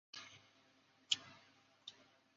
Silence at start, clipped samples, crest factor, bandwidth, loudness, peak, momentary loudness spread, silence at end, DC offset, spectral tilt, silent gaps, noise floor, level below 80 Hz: 0.15 s; under 0.1%; 32 dB; 7.4 kHz; -42 LUFS; -18 dBFS; 23 LU; 0.35 s; under 0.1%; 2 dB/octave; none; -72 dBFS; under -90 dBFS